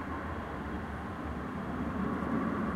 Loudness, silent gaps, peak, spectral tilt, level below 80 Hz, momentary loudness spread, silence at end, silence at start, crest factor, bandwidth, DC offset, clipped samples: -36 LUFS; none; -20 dBFS; -8 dB/octave; -46 dBFS; 6 LU; 0 s; 0 s; 16 dB; 15 kHz; under 0.1%; under 0.1%